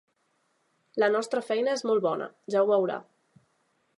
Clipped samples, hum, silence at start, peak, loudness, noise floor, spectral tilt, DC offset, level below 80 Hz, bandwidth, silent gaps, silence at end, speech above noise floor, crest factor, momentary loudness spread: under 0.1%; none; 0.95 s; -12 dBFS; -27 LUFS; -73 dBFS; -4.5 dB/octave; under 0.1%; -86 dBFS; 11.5 kHz; none; 0.95 s; 46 dB; 16 dB; 9 LU